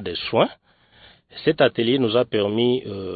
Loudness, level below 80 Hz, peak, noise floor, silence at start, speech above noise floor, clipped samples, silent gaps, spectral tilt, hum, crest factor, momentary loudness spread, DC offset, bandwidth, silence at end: -21 LUFS; -58 dBFS; -4 dBFS; -52 dBFS; 0 s; 31 dB; under 0.1%; none; -10.5 dB/octave; none; 18 dB; 6 LU; under 0.1%; 4.8 kHz; 0 s